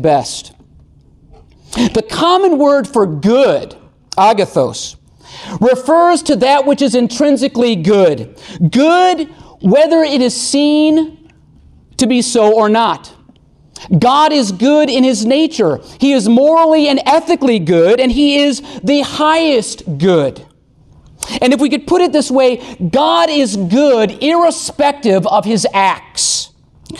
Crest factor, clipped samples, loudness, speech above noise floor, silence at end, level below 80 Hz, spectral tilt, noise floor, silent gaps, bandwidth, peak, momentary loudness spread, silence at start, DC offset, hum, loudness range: 12 dB; under 0.1%; -12 LUFS; 35 dB; 0 s; -44 dBFS; -4.5 dB/octave; -46 dBFS; none; 12.5 kHz; 0 dBFS; 9 LU; 0 s; under 0.1%; none; 3 LU